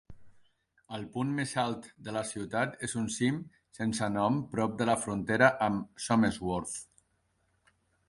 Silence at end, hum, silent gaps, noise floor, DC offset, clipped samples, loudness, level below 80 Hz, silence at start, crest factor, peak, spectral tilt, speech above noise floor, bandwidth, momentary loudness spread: 1.25 s; none; none; -74 dBFS; under 0.1%; under 0.1%; -31 LUFS; -60 dBFS; 0.1 s; 24 dB; -10 dBFS; -5 dB/octave; 44 dB; 11.5 kHz; 14 LU